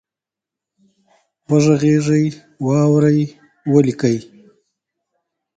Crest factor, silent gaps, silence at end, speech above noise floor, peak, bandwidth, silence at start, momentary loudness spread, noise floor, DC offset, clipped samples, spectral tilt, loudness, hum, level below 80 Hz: 18 dB; none; 1.35 s; 72 dB; 0 dBFS; 9.2 kHz; 1.5 s; 11 LU; -87 dBFS; under 0.1%; under 0.1%; -7.5 dB/octave; -16 LUFS; none; -56 dBFS